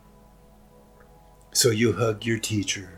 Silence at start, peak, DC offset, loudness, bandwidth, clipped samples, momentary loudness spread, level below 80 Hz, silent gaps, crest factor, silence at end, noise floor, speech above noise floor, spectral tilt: 1.55 s; -6 dBFS; under 0.1%; -23 LUFS; 17 kHz; under 0.1%; 6 LU; -56 dBFS; none; 22 dB; 0 s; -53 dBFS; 28 dB; -4 dB/octave